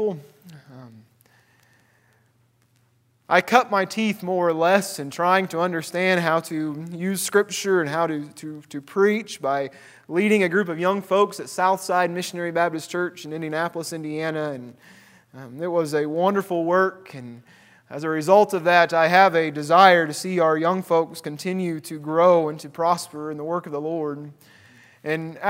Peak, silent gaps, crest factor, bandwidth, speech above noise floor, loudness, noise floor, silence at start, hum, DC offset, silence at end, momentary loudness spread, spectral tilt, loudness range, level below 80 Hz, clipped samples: 0 dBFS; none; 22 dB; 16 kHz; 41 dB; -22 LUFS; -63 dBFS; 0 s; none; under 0.1%; 0 s; 14 LU; -5 dB/octave; 8 LU; -76 dBFS; under 0.1%